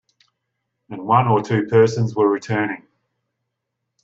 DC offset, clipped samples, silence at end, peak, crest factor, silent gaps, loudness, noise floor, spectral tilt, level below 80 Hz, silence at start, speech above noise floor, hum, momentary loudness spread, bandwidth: under 0.1%; under 0.1%; 1.25 s; 0 dBFS; 20 dB; none; -18 LUFS; -78 dBFS; -7.5 dB/octave; -62 dBFS; 0.9 s; 61 dB; none; 16 LU; 7.8 kHz